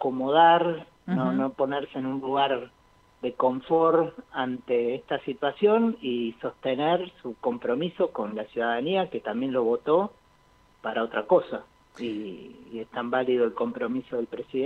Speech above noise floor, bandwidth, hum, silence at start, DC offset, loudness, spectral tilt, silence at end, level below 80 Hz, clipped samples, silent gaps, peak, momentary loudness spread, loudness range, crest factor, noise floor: 34 dB; 6.2 kHz; none; 0 s; under 0.1%; -26 LUFS; -8 dB/octave; 0 s; -66 dBFS; under 0.1%; none; -6 dBFS; 13 LU; 3 LU; 20 dB; -60 dBFS